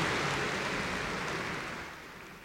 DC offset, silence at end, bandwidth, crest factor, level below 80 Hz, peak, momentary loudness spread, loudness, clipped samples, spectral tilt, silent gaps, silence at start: under 0.1%; 0 s; 16.5 kHz; 16 dB; -54 dBFS; -20 dBFS; 13 LU; -34 LUFS; under 0.1%; -3.5 dB/octave; none; 0 s